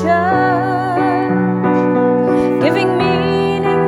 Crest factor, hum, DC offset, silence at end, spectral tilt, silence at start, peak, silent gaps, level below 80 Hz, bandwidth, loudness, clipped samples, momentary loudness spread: 14 dB; none; under 0.1%; 0 s; -7.5 dB/octave; 0 s; 0 dBFS; none; -46 dBFS; 12 kHz; -14 LUFS; under 0.1%; 2 LU